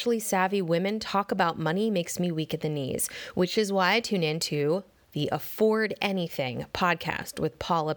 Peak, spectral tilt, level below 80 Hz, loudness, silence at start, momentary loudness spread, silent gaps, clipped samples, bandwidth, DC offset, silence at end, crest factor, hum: -10 dBFS; -4.5 dB/octave; -60 dBFS; -27 LUFS; 0 s; 7 LU; none; under 0.1%; over 20 kHz; under 0.1%; 0 s; 18 dB; none